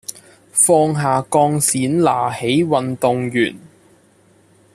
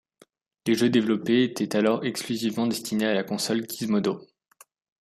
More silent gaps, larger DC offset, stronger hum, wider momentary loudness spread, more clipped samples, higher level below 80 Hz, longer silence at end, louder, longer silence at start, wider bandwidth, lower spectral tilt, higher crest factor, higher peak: neither; neither; neither; about the same, 7 LU vs 6 LU; neither; first, -58 dBFS vs -68 dBFS; first, 1.15 s vs 0.75 s; first, -16 LUFS vs -25 LUFS; second, 0.1 s vs 0.65 s; about the same, 14.5 kHz vs 14.5 kHz; about the same, -4.5 dB/octave vs -5 dB/octave; about the same, 16 dB vs 18 dB; first, -2 dBFS vs -8 dBFS